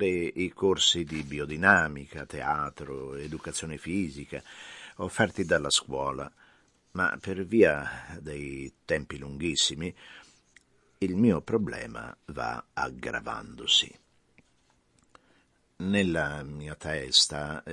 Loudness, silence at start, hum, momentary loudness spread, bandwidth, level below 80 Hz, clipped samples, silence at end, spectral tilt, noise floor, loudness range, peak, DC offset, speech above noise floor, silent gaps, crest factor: -28 LUFS; 0 s; none; 17 LU; 11.5 kHz; -54 dBFS; under 0.1%; 0 s; -3.5 dB/octave; -68 dBFS; 5 LU; -4 dBFS; under 0.1%; 39 dB; none; 26 dB